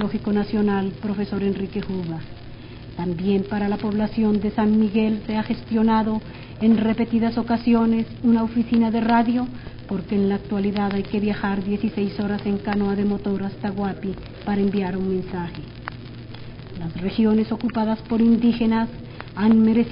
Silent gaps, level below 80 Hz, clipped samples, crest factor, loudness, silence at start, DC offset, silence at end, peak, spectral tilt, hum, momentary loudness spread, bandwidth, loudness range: none; -44 dBFS; under 0.1%; 16 dB; -22 LUFS; 0 s; under 0.1%; 0 s; -6 dBFS; -6.5 dB/octave; none; 15 LU; 5.4 kHz; 5 LU